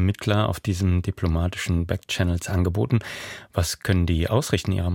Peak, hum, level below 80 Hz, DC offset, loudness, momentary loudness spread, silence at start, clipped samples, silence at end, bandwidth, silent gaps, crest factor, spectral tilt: -6 dBFS; none; -36 dBFS; under 0.1%; -24 LUFS; 4 LU; 0 s; under 0.1%; 0 s; 16.5 kHz; none; 18 dB; -6 dB/octave